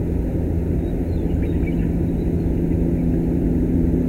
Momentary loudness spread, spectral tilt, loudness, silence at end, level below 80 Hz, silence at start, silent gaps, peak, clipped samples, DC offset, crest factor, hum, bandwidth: 3 LU; -10.5 dB/octave; -21 LUFS; 0 s; -24 dBFS; 0 s; none; -8 dBFS; under 0.1%; under 0.1%; 12 dB; none; 15 kHz